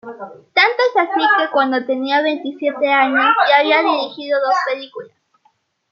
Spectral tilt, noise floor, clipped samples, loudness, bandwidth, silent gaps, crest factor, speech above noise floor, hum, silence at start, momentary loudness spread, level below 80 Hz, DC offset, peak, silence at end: -3.5 dB/octave; -61 dBFS; under 0.1%; -15 LUFS; 7.2 kHz; none; 16 dB; 45 dB; none; 0.05 s; 11 LU; -78 dBFS; under 0.1%; 0 dBFS; 0.85 s